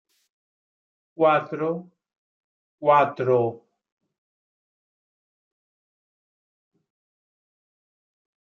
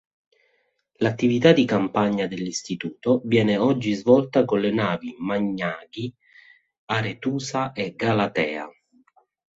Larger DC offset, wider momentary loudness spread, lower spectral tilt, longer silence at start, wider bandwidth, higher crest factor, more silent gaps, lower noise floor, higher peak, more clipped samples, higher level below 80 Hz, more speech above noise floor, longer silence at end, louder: neither; about the same, 10 LU vs 11 LU; first, -8 dB/octave vs -6 dB/octave; first, 1.2 s vs 1 s; second, 6.8 kHz vs 8 kHz; about the same, 22 dB vs 22 dB; first, 2.18-2.78 s vs 6.78-6.87 s; first, under -90 dBFS vs -69 dBFS; second, -6 dBFS vs -2 dBFS; neither; second, -80 dBFS vs -60 dBFS; first, over 69 dB vs 47 dB; first, 4.9 s vs 0.85 s; about the same, -22 LUFS vs -23 LUFS